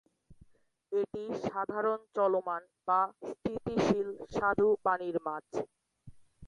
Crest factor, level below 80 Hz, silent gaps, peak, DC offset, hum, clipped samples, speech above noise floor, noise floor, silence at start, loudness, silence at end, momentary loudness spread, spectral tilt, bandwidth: 20 dB; -64 dBFS; none; -14 dBFS; under 0.1%; none; under 0.1%; 33 dB; -65 dBFS; 0.3 s; -33 LUFS; 0 s; 10 LU; -6.5 dB/octave; 9.8 kHz